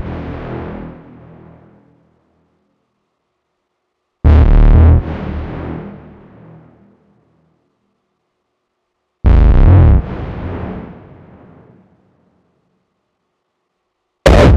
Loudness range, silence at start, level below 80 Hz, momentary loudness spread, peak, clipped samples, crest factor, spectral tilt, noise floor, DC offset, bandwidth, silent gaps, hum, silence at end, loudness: 18 LU; 0 s; -18 dBFS; 22 LU; 0 dBFS; under 0.1%; 14 dB; -8 dB/octave; -70 dBFS; under 0.1%; 8.6 kHz; none; none; 0 s; -13 LUFS